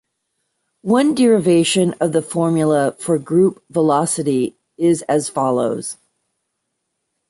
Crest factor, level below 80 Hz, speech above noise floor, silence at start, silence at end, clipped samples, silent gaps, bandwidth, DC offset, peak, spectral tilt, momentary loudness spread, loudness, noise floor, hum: 14 dB; -60 dBFS; 58 dB; 0.85 s; 1.35 s; under 0.1%; none; 11.5 kHz; under 0.1%; -4 dBFS; -5.5 dB/octave; 8 LU; -17 LUFS; -74 dBFS; none